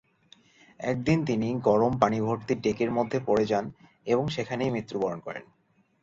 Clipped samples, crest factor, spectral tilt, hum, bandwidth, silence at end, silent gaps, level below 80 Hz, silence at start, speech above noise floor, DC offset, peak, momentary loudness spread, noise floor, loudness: under 0.1%; 22 dB; -7 dB/octave; none; 7.8 kHz; 0.6 s; none; -58 dBFS; 0.8 s; 33 dB; under 0.1%; -4 dBFS; 12 LU; -60 dBFS; -27 LUFS